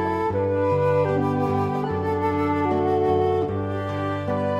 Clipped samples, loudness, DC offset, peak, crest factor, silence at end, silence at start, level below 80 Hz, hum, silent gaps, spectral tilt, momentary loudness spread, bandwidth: under 0.1%; -23 LUFS; under 0.1%; -10 dBFS; 12 dB; 0 s; 0 s; -52 dBFS; none; none; -8.5 dB/octave; 6 LU; 12 kHz